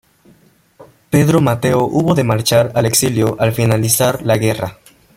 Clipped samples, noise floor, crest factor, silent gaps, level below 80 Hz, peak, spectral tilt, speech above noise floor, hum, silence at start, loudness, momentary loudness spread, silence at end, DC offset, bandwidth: under 0.1%; -51 dBFS; 16 dB; none; -46 dBFS; 0 dBFS; -5 dB/octave; 37 dB; none; 0.8 s; -14 LUFS; 3 LU; 0.45 s; under 0.1%; 16.5 kHz